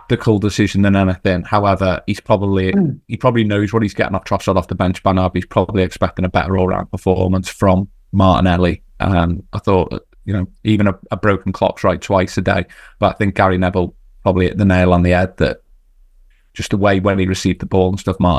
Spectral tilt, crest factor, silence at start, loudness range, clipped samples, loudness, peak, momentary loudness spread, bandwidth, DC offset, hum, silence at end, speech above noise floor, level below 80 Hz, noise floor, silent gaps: -7 dB/octave; 16 dB; 0.1 s; 2 LU; under 0.1%; -16 LUFS; 0 dBFS; 7 LU; 12.5 kHz; under 0.1%; none; 0 s; 34 dB; -30 dBFS; -49 dBFS; none